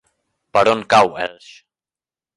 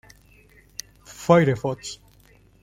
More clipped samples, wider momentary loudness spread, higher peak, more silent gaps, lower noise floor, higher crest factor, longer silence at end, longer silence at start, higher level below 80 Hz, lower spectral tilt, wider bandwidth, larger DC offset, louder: neither; second, 13 LU vs 22 LU; about the same, 0 dBFS vs -2 dBFS; neither; first, under -90 dBFS vs -55 dBFS; about the same, 18 dB vs 22 dB; first, 1.05 s vs 0.7 s; second, 0.55 s vs 1.1 s; about the same, -56 dBFS vs -56 dBFS; second, -4 dB/octave vs -6 dB/octave; second, 11.5 kHz vs 15.5 kHz; neither; first, -16 LUFS vs -21 LUFS